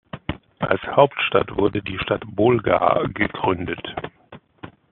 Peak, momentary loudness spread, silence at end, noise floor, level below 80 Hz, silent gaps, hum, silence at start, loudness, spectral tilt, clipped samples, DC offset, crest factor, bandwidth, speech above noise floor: 0 dBFS; 15 LU; 0.2 s; -47 dBFS; -48 dBFS; none; none; 0.15 s; -21 LUFS; -4 dB/octave; under 0.1%; under 0.1%; 22 dB; 4.3 kHz; 27 dB